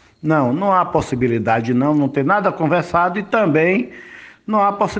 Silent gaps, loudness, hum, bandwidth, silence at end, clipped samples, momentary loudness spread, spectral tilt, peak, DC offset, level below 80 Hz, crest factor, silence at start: none; -17 LUFS; none; 9 kHz; 0 s; under 0.1%; 5 LU; -7.5 dB/octave; 0 dBFS; under 0.1%; -48 dBFS; 16 dB; 0.25 s